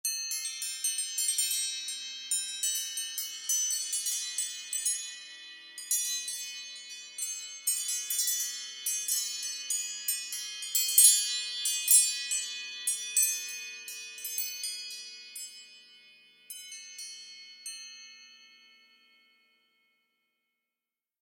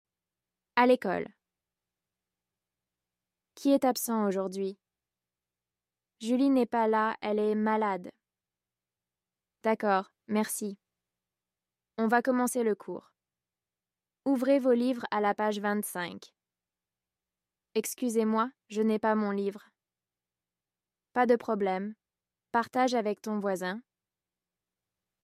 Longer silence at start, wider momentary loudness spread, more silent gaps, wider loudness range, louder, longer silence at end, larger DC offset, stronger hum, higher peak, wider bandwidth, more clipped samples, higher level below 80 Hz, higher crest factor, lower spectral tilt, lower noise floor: second, 0.05 s vs 0.75 s; first, 17 LU vs 11 LU; neither; first, 20 LU vs 4 LU; about the same, -28 LUFS vs -29 LUFS; first, 2.65 s vs 1.6 s; neither; neither; first, -4 dBFS vs -10 dBFS; about the same, 16.5 kHz vs 15.5 kHz; neither; second, under -90 dBFS vs -80 dBFS; first, 28 dB vs 20 dB; second, 6.5 dB/octave vs -5 dB/octave; about the same, under -90 dBFS vs under -90 dBFS